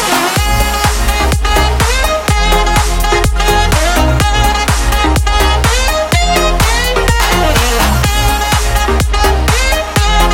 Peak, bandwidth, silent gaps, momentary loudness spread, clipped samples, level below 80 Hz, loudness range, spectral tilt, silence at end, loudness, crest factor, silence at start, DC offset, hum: 0 dBFS; 17 kHz; none; 2 LU; under 0.1%; -14 dBFS; 1 LU; -3.5 dB/octave; 0 s; -11 LUFS; 10 dB; 0 s; under 0.1%; none